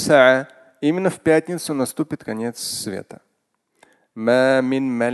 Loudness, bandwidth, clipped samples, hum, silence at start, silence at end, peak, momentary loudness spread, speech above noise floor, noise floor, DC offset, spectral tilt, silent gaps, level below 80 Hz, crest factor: -20 LUFS; 12.5 kHz; under 0.1%; none; 0 s; 0 s; 0 dBFS; 12 LU; 52 dB; -71 dBFS; under 0.1%; -4.5 dB/octave; none; -60 dBFS; 20 dB